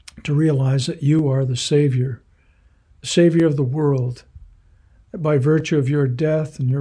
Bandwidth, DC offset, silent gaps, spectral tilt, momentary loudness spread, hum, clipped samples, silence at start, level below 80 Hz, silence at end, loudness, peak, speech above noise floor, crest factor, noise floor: 10.5 kHz; under 0.1%; none; -7 dB/octave; 10 LU; none; under 0.1%; 0.15 s; -52 dBFS; 0 s; -19 LUFS; -4 dBFS; 37 dB; 14 dB; -55 dBFS